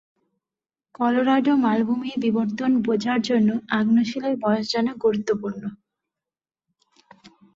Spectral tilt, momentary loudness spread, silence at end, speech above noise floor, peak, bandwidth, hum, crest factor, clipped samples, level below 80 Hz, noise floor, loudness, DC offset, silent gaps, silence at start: -6 dB/octave; 7 LU; 0.25 s; over 69 dB; -8 dBFS; 7.6 kHz; none; 16 dB; under 0.1%; -66 dBFS; under -90 dBFS; -22 LUFS; under 0.1%; none; 1 s